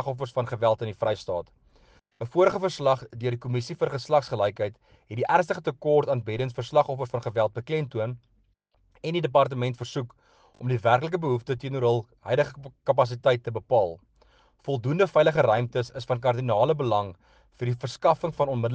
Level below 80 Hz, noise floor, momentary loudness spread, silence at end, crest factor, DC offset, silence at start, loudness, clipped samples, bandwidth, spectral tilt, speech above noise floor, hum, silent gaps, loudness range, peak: -62 dBFS; -67 dBFS; 10 LU; 0 s; 20 dB; under 0.1%; 0 s; -26 LUFS; under 0.1%; 8.8 kHz; -7 dB/octave; 42 dB; none; none; 3 LU; -6 dBFS